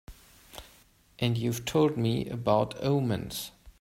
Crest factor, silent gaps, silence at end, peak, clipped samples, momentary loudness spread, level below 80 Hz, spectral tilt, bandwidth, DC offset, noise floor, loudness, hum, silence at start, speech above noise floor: 20 dB; none; 0.1 s; -10 dBFS; under 0.1%; 21 LU; -56 dBFS; -6 dB/octave; 16 kHz; under 0.1%; -60 dBFS; -29 LUFS; none; 0.1 s; 32 dB